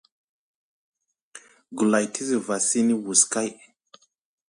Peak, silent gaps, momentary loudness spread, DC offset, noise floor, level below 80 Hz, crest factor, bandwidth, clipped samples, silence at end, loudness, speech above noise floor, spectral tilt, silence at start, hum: -2 dBFS; none; 9 LU; under 0.1%; -57 dBFS; -74 dBFS; 24 dB; 11.5 kHz; under 0.1%; 0.95 s; -22 LUFS; 34 dB; -3 dB/octave; 1.35 s; none